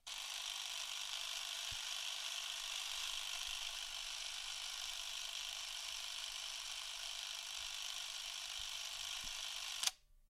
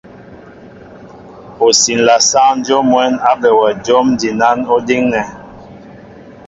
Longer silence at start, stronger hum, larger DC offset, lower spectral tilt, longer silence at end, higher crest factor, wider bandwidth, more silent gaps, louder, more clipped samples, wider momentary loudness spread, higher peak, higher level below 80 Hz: second, 0.05 s vs 0.2 s; neither; neither; second, 3 dB/octave vs -2.5 dB/octave; about the same, 0.05 s vs 0.15 s; first, 28 dB vs 14 dB; first, 16.5 kHz vs 8 kHz; neither; second, -43 LUFS vs -11 LUFS; neither; about the same, 3 LU vs 5 LU; second, -18 dBFS vs 0 dBFS; second, -68 dBFS vs -50 dBFS